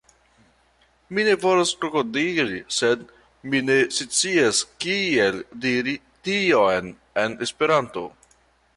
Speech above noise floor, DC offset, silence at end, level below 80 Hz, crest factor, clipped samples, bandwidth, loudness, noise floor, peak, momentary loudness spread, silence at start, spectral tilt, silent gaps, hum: 39 dB; under 0.1%; 0.7 s; -60 dBFS; 16 dB; under 0.1%; 11.5 kHz; -22 LUFS; -61 dBFS; -6 dBFS; 10 LU; 1.1 s; -3 dB/octave; none; none